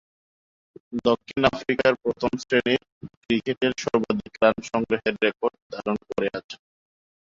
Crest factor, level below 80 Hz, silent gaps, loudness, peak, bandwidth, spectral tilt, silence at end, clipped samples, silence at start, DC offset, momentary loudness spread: 22 dB; -56 dBFS; 2.92-3.01 s, 3.17-3.21 s, 3.57-3.61 s, 5.62-5.70 s, 6.44-6.49 s; -24 LUFS; -4 dBFS; 7.8 kHz; -5 dB/octave; 0.85 s; under 0.1%; 0.9 s; under 0.1%; 8 LU